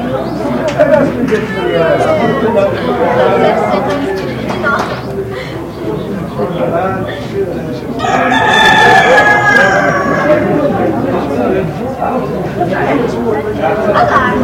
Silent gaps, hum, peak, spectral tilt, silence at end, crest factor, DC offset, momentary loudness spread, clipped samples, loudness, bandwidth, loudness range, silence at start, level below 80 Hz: none; none; 0 dBFS; -5.5 dB/octave; 0 s; 12 dB; under 0.1%; 12 LU; 0.3%; -11 LUFS; 17 kHz; 8 LU; 0 s; -36 dBFS